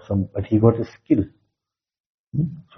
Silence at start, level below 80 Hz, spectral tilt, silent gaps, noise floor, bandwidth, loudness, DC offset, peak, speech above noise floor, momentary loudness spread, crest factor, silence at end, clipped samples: 0.1 s; -52 dBFS; -10.5 dB/octave; 2.00-2.25 s; -86 dBFS; 6.2 kHz; -22 LUFS; under 0.1%; -2 dBFS; 65 dB; 11 LU; 22 dB; 0.15 s; under 0.1%